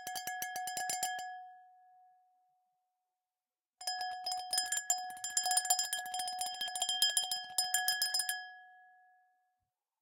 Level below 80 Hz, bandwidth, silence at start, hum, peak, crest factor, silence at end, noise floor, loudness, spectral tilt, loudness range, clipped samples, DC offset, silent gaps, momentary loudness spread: -86 dBFS; 17.5 kHz; 0 s; none; -14 dBFS; 24 dB; 1.15 s; under -90 dBFS; -34 LUFS; 3 dB/octave; 12 LU; under 0.1%; under 0.1%; none; 11 LU